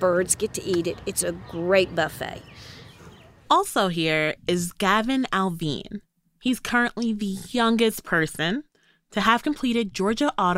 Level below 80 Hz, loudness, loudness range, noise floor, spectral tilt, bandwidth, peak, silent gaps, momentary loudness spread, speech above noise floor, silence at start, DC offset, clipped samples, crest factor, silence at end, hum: -52 dBFS; -24 LUFS; 2 LU; -48 dBFS; -4 dB/octave; 16 kHz; -4 dBFS; none; 12 LU; 24 dB; 0 s; under 0.1%; under 0.1%; 20 dB; 0 s; none